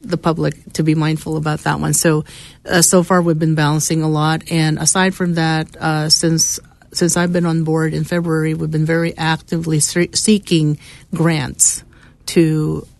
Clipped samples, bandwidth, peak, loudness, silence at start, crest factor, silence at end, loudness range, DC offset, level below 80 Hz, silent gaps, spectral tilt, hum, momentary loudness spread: under 0.1%; 12.5 kHz; 0 dBFS; -16 LUFS; 0.05 s; 16 dB; 0.15 s; 2 LU; under 0.1%; -44 dBFS; none; -4 dB/octave; none; 7 LU